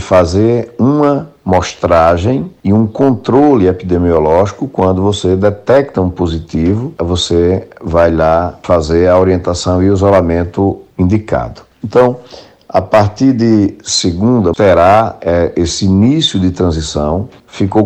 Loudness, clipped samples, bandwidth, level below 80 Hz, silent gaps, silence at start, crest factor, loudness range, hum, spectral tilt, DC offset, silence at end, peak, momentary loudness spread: -11 LUFS; under 0.1%; 9 kHz; -32 dBFS; none; 0 s; 10 dB; 2 LU; none; -6 dB/octave; under 0.1%; 0 s; 0 dBFS; 7 LU